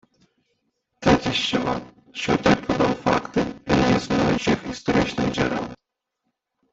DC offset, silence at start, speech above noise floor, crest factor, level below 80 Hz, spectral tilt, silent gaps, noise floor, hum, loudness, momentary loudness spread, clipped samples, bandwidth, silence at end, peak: under 0.1%; 1 s; 56 dB; 20 dB; -44 dBFS; -5.5 dB/octave; none; -79 dBFS; none; -22 LUFS; 8 LU; under 0.1%; 8 kHz; 0.95 s; -4 dBFS